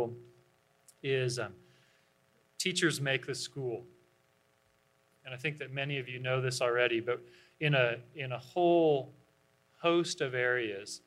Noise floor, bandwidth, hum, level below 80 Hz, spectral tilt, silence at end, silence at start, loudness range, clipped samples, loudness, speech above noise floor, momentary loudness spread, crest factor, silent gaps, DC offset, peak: -71 dBFS; 14 kHz; none; -78 dBFS; -4.5 dB/octave; 0.1 s; 0 s; 6 LU; under 0.1%; -32 LUFS; 39 dB; 11 LU; 22 dB; none; under 0.1%; -12 dBFS